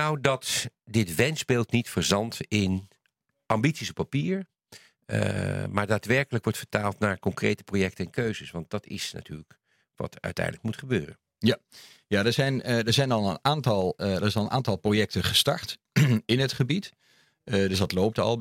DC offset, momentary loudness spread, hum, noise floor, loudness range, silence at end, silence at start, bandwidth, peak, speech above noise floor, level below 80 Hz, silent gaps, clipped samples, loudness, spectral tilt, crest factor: under 0.1%; 10 LU; none; -76 dBFS; 7 LU; 0 s; 0 s; 16.5 kHz; -2 dBFS; 49 dB; -60 dBFS; none; under 0.1%; -27 LUFS; -5 dB/octave; 24 dB